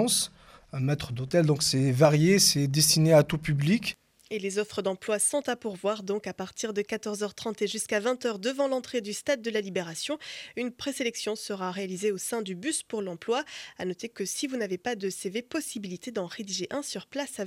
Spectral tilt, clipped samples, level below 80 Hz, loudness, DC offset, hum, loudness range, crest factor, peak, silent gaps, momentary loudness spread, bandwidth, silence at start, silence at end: -4 dB/octave; under 0.1%; -60 dBFS; -28 LUFS; under 0.1%; none; 10 LU; 22 dB; -8 dBFS; none; 14 LU; 16 kHz; 0 s; 0 s